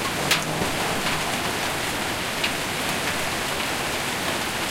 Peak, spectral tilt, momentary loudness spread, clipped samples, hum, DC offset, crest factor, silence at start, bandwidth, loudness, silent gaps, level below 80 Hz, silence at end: -6 dBFS; -2.5 dB/octave; 3 LU; under 0.1%; none; under 0.1%; 20 dB; 0 s; 16.5 kHz; -24 LUFS; none; -46 dBFS; 0 s